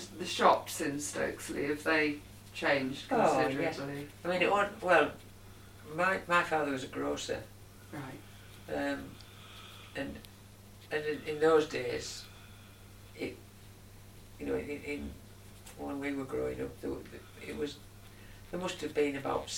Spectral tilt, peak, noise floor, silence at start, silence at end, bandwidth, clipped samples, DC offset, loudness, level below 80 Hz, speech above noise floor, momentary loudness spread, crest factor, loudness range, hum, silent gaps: -4 dB/octave; -10 dBFS; -54 dBFS; 0 s; 0 s; 16.5 kHz; under 0.1%; under 0.1%; -33 LUFS; -58 dBFS; 21 dB; 25 LU; 24 dB; 11 LU; none; none